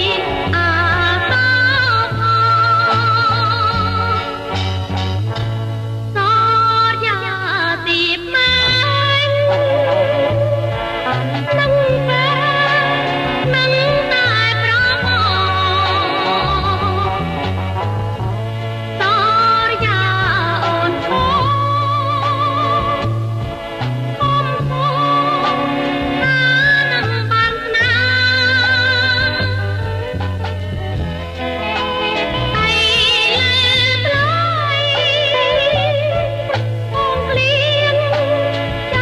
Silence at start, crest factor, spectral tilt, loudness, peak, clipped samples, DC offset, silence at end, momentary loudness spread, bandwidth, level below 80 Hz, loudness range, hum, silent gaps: 0 s; 12 dB; -5.5 dB/octave; -15 LUFS; -4 dBFS; under 0.1%; under 0.1%; 0 s; 9 LU; 12.5 kHz; -36 dBFS; 4 LU; none; none